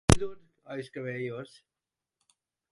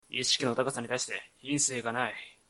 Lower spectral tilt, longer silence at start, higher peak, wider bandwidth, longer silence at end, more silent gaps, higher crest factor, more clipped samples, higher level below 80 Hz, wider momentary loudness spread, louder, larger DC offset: first, -5 dB/octave vs -2 dB/octave; about the same, 0.1 s vs 0.1 s; first, -2 dBFS vs -14 dBFS; about the same, 11.5 kHz vs 12 kHz; first, 1.25 s vs 0.15 s; neither; first, 30 dB vs 18 dB; neither; first, -40 dBFS vs -70 dBFS; first, 16 LU vs 8 LU; second, -33 LUFS vs -30 LUFS; neither